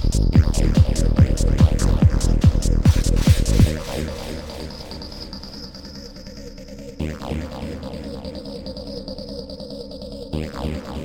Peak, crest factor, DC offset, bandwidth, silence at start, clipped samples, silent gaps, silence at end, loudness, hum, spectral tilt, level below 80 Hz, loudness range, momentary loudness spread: -2 dBFS; 18 dB; 0.2%; 17 kHz; 0 s; under 0.1%; none; 0 s; -20 LUFS; none; -6.5 dB/octave; -24 dBFS; 14 LU; 17 LU